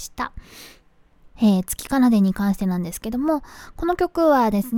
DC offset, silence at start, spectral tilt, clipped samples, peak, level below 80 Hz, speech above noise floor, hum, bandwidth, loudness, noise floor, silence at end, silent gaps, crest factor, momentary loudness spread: under 0.1%; 0 s; -6 dB/octave; under 0.1%; -6 dBFS; -44 dBFS; 32 dB; none; 18.5 kHz; -21 LUFS; -52 dBFS; 0 s; none; 16 dB; 12 LU